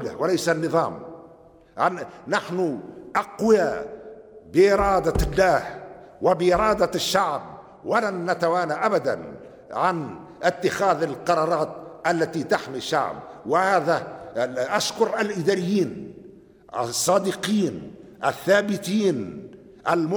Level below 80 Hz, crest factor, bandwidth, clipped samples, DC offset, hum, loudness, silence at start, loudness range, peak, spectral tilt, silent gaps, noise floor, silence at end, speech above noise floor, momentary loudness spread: -44 dBFS; 16 dB; over 20 kHz; under 0.1%; under 0.1%; none; -23 LUFS; 0 s; 4 LU; -6 dBFS; -4.5 dB/octave; none; -51 dBFS; 0 s; 28 dB; 16 LU